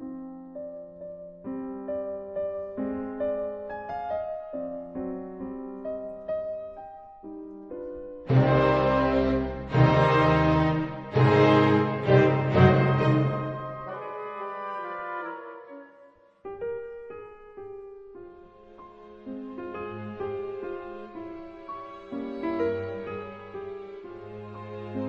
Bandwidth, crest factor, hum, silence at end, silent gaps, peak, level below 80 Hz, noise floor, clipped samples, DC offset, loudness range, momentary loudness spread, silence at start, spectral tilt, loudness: 6.4 kHz; 22 dB; none; 0 s; none; -6 dBFS; -48 dBFS; -55 dBFS; under 0.1%; under 0.1%; 18 LU; 22 LU; 0 s; -8.5 dB/octave; -26 LUFS